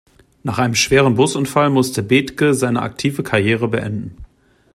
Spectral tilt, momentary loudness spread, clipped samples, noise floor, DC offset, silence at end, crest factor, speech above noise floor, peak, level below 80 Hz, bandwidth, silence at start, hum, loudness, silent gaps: -5 dB/octave; 11 LU; under 0.1%; -46 dBFS; under 0.1%; 0.5 s; 16 dB; 29 dB; -2 dBFS; -46 dBFS; 15.5 kHz; 0.45 s; none; -16 LUFS; none